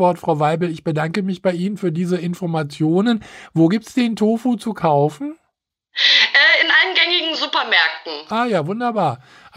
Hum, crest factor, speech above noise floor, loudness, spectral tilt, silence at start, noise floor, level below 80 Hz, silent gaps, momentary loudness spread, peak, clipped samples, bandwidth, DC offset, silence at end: none; 16 dB; 55 dB; -17 LUFS; -5 dB/octave; 0 s; -73 dBFS; -62 dBFS; none; 12 LU; -2 dBFS; under 0.1%; 15.5 kHz; under 0.1%; 0.4 s